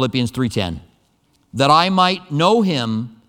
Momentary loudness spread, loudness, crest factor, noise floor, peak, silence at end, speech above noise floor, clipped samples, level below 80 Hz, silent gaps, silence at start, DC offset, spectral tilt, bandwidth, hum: 12 LU; -17 LUFS; 18 dB; -60 dBFS; 0 dBFS; 0.2 s; 43 dB; under 0.1%; -48 dBFS; none; 0 s; under 0.1%; -5.5 dB/octave; 16.5 kHz; none